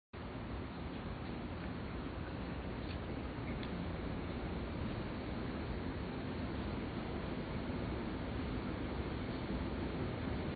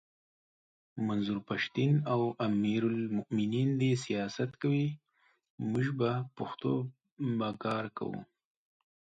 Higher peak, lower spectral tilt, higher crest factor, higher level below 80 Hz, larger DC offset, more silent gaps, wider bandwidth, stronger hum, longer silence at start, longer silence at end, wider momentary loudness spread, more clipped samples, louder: second, -28 dBFS vs -18 dBFS; about the same, -6 dB/octave vs -7 dB/octave; about the same, 14 dB vs 16 dB; first, -48 dBFS vs -70 dBFS; neither; second, none vs 5.50-5.58 s, 7.12-7.17 s; second, 4.8 kHz vs 9 kHz; neither; second, 0.15 s vs 0.95 s; second, 0 s vs 0.8 s; second, 4 LU vs 10 LU; neither; second, -42 LUFS vs -33 LUFS